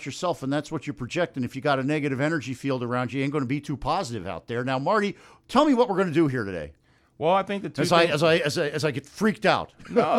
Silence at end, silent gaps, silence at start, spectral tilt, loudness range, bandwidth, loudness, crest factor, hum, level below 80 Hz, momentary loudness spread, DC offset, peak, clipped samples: 0 s; none; 0 s; -5.5 dB/octave; 4 LU; 15 kHz; -25 LUFS; 18 dB; none; -54 dBFS; 10 LU; under 0.1%; -6 dBFS; under 0.1%